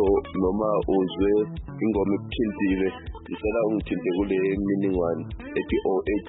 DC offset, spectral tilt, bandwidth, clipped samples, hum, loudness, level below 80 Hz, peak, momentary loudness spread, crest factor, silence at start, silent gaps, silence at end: under 0.1%; -11.5 dB/octave; 4 kHz; under 0.1%; none; -25 LUFS; -42 dBFS; -12 dBFS; 7 LU; 14 dB; 0 s; none; 0 s